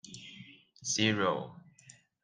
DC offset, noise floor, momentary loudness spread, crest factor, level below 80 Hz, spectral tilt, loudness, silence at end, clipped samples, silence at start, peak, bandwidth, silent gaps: under 0.1%; -60 dBFS; 22 LU; 20 dB; -76 dBFS; -3 dB/octave; -31 LUFS; 0.3 s; under 0.1%; 0.05 s; -16 dBFS; 10.5 kHz; none